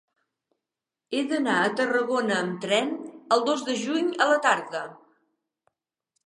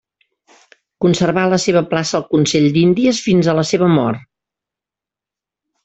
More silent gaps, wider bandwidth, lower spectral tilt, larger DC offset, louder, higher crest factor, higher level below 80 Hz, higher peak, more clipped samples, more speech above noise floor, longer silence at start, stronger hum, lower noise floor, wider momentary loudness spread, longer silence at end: neither; first, 11.5 kHz vs 8.2 kHz; second, -3.5 dB/octave vs -5.5 dB/octave; neither; second, -25 LUFS vs -15 LUFS; first, 20 dB vs 14 dB; second, -82 dBFS vs -52 dBFS; second, -8 dBFS vs -2 dBFS; neither; second, 64 dB vs 73 dB; about the same, 1.1 s vs 1 s; neither; about the same, -88 dBFS vs -87 dBFS; first, 10 LU vs 5 LU; second, 1.35 s vs 1.65 s